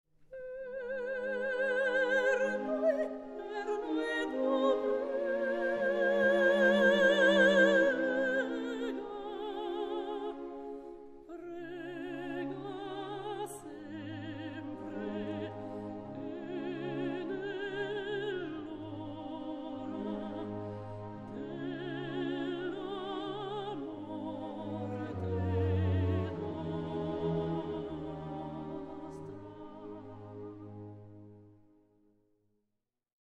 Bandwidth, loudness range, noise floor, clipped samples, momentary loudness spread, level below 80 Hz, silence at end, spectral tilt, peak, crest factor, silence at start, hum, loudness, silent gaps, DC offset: 12.5 kHz; 15 LU; -85 dBFS; under 0.1%; 18 LU; -62 dBFS; 1.75 s; -6.5 dB/octave; -14 dBFS; 20 dB; 0.2 s; none; -34 LUFS; none; under 0.1%